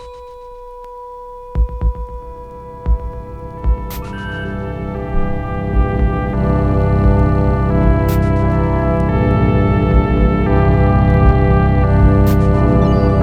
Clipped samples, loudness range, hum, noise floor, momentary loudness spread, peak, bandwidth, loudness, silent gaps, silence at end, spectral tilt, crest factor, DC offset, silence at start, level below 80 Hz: under 0.1%; 11 LU; none; -33 dBFS; 20 LU; 0 dBFS; 15 kHz; -15 LUFS; none; 0 s; -9 dB/octave; 14 dB; under 0.1%; 0 s; -18 dBFS